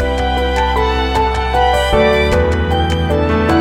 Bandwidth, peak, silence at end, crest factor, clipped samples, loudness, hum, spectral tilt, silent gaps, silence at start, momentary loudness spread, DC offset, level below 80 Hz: 15 kHz; 0 dBFS; 0 s; 12 dB; under 0.1%; -14 LUFS; none; -6 dB/octave; none; 0 s; 3 LU; under 0.1%; -20 dBFS